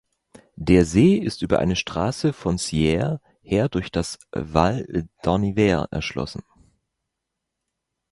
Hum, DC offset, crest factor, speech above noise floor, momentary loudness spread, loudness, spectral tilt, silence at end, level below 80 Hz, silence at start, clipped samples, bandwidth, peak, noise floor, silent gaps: none; under 0.1%; 22 dB; 60 dB; 12 LU; -22 LUFS; -6 dB/octave; 1.7 s; -40 dBFS; 0.6 s; under 0.1%; 11.5 kHz; 0 dBFS; -81 dBFS; none